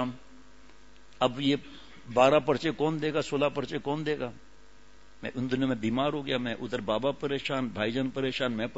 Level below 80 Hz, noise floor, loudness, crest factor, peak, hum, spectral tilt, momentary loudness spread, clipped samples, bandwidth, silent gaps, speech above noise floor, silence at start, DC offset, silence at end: -60 dBFS; -58 dBFS; -29 LUFS; 22 dB; -8 dBFS; none; -6 dB/octave; 10 LU; under 0.1%; 8 kHz; none; 29 dB; 0 s; 0.4%; 0 s